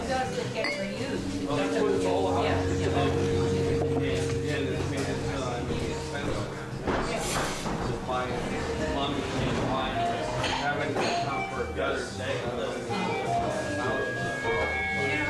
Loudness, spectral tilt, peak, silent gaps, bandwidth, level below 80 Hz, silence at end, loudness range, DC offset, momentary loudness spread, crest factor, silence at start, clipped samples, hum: -29 LUFS; -5 dB/octave; -14 dBFS; none; 12.5 kHz; -42 dBFS; 0 s; 4 LU; under 0.1%; 5 LU; 14 dB; 0 s; under 0.1%; none